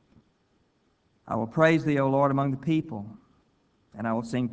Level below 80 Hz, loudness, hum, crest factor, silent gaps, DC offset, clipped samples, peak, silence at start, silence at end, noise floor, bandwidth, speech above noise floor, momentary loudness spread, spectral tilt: -62 dBFS; -26 LUFS; none; 22 dB; none; under 0.1%; under 0.1%; -6 dBFS; 1.25 s; 0 s; -69 dBFS; 8 kHz; 43 dB; 15 LU; -8 dB/octave